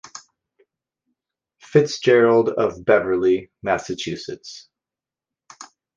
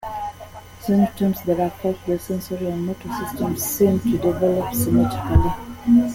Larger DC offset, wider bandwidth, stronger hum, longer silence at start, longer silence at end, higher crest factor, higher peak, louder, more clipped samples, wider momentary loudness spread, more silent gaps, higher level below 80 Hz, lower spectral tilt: neither; second, 7.6 kHz vs 17 kHz; neither; first, 0.15 s vs 0 s; first, 0.3 s vs 0 s; about the same, 20 dB vs 18 dB; about the same, -2 dBFS vs -2 dBFS; about the same, -19 LUFS vs -21 LUFS; neither; first, 22 LU vs 11 LU; neither; second, -58 dBFS vs -34 dBFS; second, -5.5 dB/octave vs -7 dB/octave